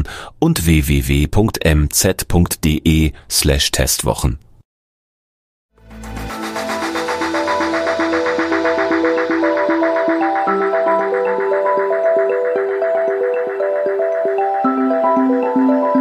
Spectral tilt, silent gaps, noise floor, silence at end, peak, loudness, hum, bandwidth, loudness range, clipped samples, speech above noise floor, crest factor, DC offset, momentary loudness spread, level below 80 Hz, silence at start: -5 dB/octave; 4.65-5.69 s; under -90 dBFS; 0 s; -2 dBFS; -16 LUFS; none; 15.5 kHz; 6 LU; under 0.1%; over 75 dB; 14 dB; under 0.1%; 6 LU; -28 dBFS; 0 s